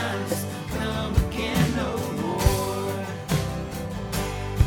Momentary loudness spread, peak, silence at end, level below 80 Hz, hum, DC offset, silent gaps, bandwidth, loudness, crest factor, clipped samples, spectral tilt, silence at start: 7 LU; -6 dBFS; 0 s; -32 dBFS; none; under 0.1%; none; over 20 kHz; -27 LUFS; 20 dB; under 0.1%; -5.5 dB/octave; 0 s